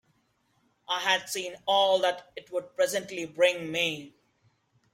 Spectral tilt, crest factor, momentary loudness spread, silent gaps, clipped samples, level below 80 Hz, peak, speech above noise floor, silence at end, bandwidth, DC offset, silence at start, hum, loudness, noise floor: -2 dB/octave; 20 dB; 12 LU; none; under 0.1%; -74 dBFS; -10 dBFS; 43 dB; 0.85 s; 16.5 kHz; under 0.1%; 0.9 s; none; -27 LUFS; -71 dBFS